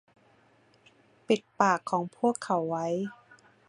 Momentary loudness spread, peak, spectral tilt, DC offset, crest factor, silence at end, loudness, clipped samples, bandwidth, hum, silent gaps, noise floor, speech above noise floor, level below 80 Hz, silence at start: 7 LU; -8 dBFS; -5.5 dB/octave; under 0.1%; 24 dB; 0.55 s; -29 LUFS; under 0.1%; 11 kHz; none; none; -63 dBFS; 35 dB; -78 dBFS; 1.3 s